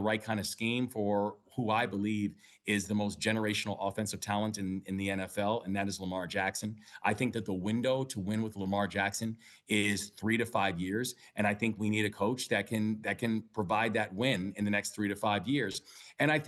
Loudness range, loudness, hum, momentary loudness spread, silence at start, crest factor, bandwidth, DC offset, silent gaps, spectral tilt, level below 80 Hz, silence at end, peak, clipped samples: 2 LU; -33 LUFS; none; 6 LU; 0 s; 18 dB; 12.5 kHz; under 0.1%; none; -4.5 dB/octave; -70 dBFS; 0 s; -14 dBFS; under 0.1%